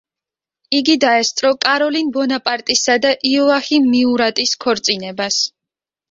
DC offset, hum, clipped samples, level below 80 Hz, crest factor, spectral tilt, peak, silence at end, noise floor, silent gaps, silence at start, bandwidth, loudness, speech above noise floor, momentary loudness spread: under 0.1%; none; under 0.1%; -60 dBFS; 16 dB; -2 dB/octave; 0 dBFS; 0.65 s; -87 dBFS; none; 0.7 s; 7.8 kHz; -15 LUFS; 72 dB; 5 LU